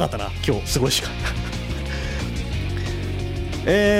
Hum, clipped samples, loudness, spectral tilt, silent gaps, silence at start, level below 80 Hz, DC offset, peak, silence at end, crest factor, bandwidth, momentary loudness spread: none; under 0.1%; -24 LUFS; -4.5 dB/octave; none; 0 s; -30 dBFS; under 0.1%; -8 dBFS; 0 s; 14 dB; 16 kHz; 8 LU